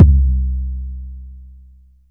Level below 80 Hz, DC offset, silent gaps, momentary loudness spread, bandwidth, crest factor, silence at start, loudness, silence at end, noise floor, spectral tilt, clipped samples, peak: -18 dBFS; under 0.1%; none; 24 LU; 1 kHz; 16 dB; 0 s; -18 LUFS; 0.65 s; -45 dBFS; -12.5 dB/octave; 0.6%; 0 dBFS